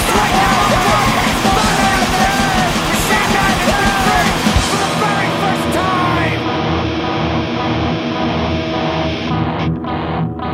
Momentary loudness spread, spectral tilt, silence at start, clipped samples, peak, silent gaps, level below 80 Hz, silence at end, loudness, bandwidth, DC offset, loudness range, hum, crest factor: 6 LU; -4 dB/octave; 0 s; under 0.1%; 0 dBFS; none; -28 dBFS; 0 s; -15 LUFS; 16.5 kHz; under 0.1%; 5 LU; none; 14 dB